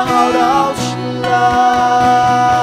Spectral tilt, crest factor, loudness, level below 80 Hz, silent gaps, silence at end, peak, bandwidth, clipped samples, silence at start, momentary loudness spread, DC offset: -4.5 dB/octave; 12 dB; -12 LUFS; -42 dBFS; none; 0 s; 0 dBFS; 14.5 kHz; under 0.1%; 0 s; 7 LU; under 0.1%